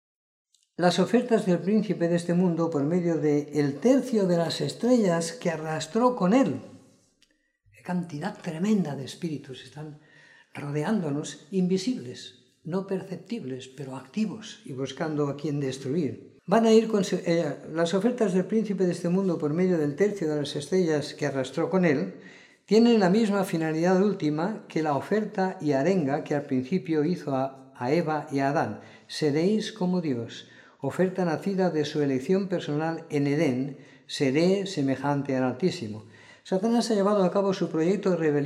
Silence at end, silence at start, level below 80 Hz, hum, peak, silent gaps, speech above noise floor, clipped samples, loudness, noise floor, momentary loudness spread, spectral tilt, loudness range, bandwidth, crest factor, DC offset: 0 s; 0.8 s; -76 dBFS; none; -8 dBFS; none; 42 dB; under 0.1%; -26 LUFS; -68 dBFS; 12 LU; -6.5 dB/octave; 7 LU; 13 kHz; 18 dB; under 0.1%